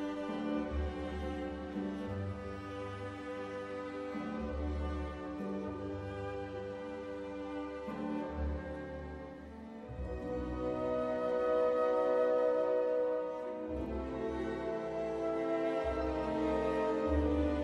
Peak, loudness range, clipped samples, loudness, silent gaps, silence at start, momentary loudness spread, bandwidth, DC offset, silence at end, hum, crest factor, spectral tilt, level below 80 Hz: -20 dBFS; 9 LU; under 0.1%; -37 LUFS; none; 0 s; 12 LU; 10 kHz; under 0.1%; 0 s; none; 16 dB; -8 dB/octave; -46 dBFS